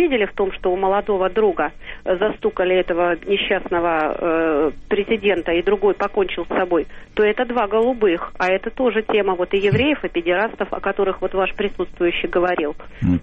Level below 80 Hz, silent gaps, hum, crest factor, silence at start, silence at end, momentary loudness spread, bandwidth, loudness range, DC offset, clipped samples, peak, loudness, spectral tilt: -40 dBFS; none; none; 12 dB; 0 s; 0 s; 5 LU; 6.6 kHz; 1 LU; under 0.1%; under 0.1%; -8 dBFS; -20 LUFS; -7.5 dB/octave